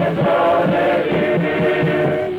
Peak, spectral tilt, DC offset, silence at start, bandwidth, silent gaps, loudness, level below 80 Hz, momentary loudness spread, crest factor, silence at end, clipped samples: -6 dBFS; -8 dB/octave; under 0.1%; 0 s; 16.5 kHz; none; -16 LUFS; -50 dBFS; 2 LU; 10 dB; 0 s; under 0.1%